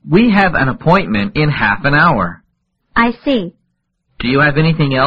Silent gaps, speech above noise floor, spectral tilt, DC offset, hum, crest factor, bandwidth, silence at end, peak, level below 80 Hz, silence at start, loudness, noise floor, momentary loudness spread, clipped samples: none; 54 dB; -8.5 dB/octave; under 0.1%; none; 14 dB; 5.4 kHz; 0 s; 0 dBFS; -34 dBFS; 0.05 s; -13 LUFS; -66 dBFS; 8 LU; under 0.1%